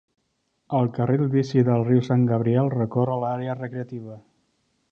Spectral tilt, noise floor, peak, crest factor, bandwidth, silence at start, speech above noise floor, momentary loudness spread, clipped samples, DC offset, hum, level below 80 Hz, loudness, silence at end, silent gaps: -9.5 dB/octave; -72 dBFS; -6 dBFS; 16 dB; 6.8 kHz; 0.7 s; 51 dB; 12 LU; under 0.1%; under 0.1%; none; -62 dBFS; -23 LUFS; 0.7 s; none